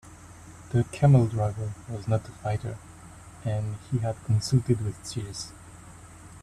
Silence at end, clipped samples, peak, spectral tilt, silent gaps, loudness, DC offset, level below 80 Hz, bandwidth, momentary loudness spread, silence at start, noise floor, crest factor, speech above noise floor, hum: 0.05 s; under 0.1%; -8 dBFS; -7 dB/octave; none; -27 LUFS; under 0.1%; -52 dBFS; 12.5 kHz; 26 LU; 0.05 s; -47 dBFS; 20 dB; 21 dB; none